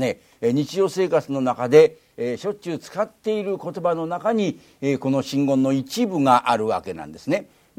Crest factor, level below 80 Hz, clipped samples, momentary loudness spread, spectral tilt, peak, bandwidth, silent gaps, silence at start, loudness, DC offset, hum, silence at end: 20 dB; -64 dBFS; under 0.1%; 11 LU; -6 dB/octave; -2 dBFS; 15.5 kHz; none; 0 s; -22 LUFS; under 0.1%; none; 0.35 s